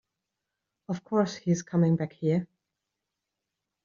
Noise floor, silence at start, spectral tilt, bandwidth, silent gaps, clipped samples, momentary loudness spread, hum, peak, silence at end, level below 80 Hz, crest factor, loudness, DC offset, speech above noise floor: -86 dBFS; 0.9 s; -8 dB/octave; 7.4 kHz; none; under 0.1%; 12 LU; none; -14 dBFS; 1.4 s; -70 dBFS; 18 dB; -28 LUFS; under 0.1%; 59 dB